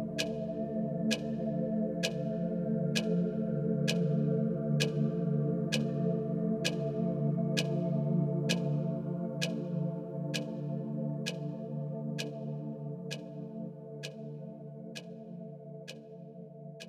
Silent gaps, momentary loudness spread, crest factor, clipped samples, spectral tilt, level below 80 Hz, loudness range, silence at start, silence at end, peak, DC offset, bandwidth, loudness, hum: none; 14 LU; 20 dB; under 0.1%; -6 dB/octave; -66 dBFS; 11 LU; 0 s; 0 s; -14 dBFS; under 0.1%; 14 kHz; -34 LUFS; none